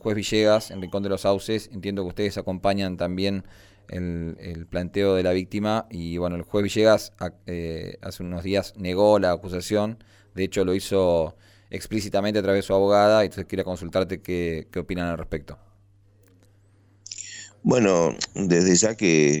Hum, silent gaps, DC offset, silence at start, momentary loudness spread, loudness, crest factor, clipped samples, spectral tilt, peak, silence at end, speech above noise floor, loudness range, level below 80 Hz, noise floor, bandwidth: none; none; under 0.1%; 0.05 s; 15 LU; -24 LUFS; 18 dB; under 0.1%; -5 dB/octave; -6 dBFS; 0 s; 34 dB; 6 LU; -48 dBFS; -57 dBFS; 18.5 kHz